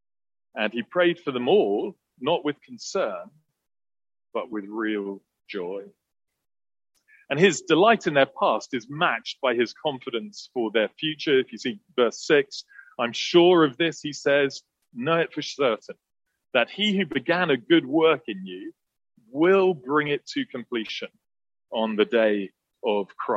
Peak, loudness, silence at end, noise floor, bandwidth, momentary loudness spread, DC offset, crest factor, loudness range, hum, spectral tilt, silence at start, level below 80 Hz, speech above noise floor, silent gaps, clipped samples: -4 dBFS; -24 LUFS; 0 s; under -90 dBFS; 8 kHz; 15 LU; under 0.1%; 20 dB; 9 LU; none; -4.5 dB/octave; 0.55 s; -74 dBFS; over 66 dB; none; under 0.1%